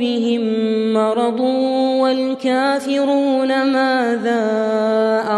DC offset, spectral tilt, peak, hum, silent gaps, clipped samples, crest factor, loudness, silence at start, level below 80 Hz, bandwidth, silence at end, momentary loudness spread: under 0.1%; -5.5 dB/octave; -4 dBFS; none; none; under 0.1%; 12 dB; -17 LUFS; 0 s; -70 dBFS; 11.5 kHz; 0 s; 2 LU